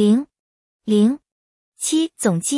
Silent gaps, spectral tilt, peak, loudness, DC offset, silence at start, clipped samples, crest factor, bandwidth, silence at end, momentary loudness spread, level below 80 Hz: 0.39-0.80 s, 1.32-1.72 s; -5 dB/octave; -4 dBFS; -19 LUFS; under 0.1%; 0 s; under 0.1%; 16 dB; 12 kHz; 0 s; 15 LU; -68 dBFS